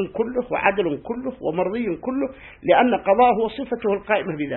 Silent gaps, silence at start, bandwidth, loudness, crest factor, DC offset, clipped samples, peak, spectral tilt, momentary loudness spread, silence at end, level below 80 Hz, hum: none; 0 s; 4.2 kHz; -22 LUFS; 18 dB; under 0.1%; under 0.1%; -2 dBFS; -10.5 dB/octave; 10 LU; 0 s; -52 dBFS; none